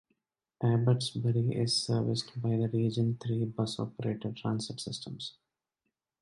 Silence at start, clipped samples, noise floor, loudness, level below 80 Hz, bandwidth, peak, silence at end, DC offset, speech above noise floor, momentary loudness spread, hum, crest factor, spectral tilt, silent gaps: 0.6 s; under 0.1%; -85 dBFS; -32 LUFS; -66 dBFS; 11.5 kHz; -16 dBFS; 0.9 s; under 0.1%; 55 dB; 10 LU; none; 16 dB; -6 dB/octave; none